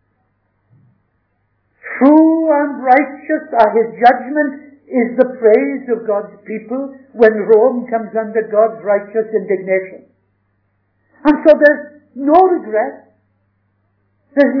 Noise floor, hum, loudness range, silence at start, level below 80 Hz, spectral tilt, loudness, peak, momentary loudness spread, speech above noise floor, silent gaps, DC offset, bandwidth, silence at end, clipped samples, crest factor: -64 dBFS; none; 4 LU; 1.85 s; -56 dBFS; -8.5 dB/octave; -14 LUFS; 0 dBFS; 14 LU; 50 dB; none; under 0.1%; 5.4 kHz; 0 s; 0.3%; 14 dB